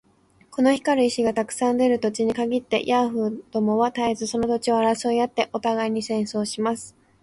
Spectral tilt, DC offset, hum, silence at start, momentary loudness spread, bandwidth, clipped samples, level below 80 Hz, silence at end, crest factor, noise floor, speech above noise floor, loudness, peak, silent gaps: -4.5 dB/octave; under 0.1%; none; 0.5 s; 6 LU; 11.5 kHz; under 0.1%; -60 dBFS; 0.35 s; 16 dB; -57 dBFS; 35 dB; -23 LUFS; -6 dBFS; none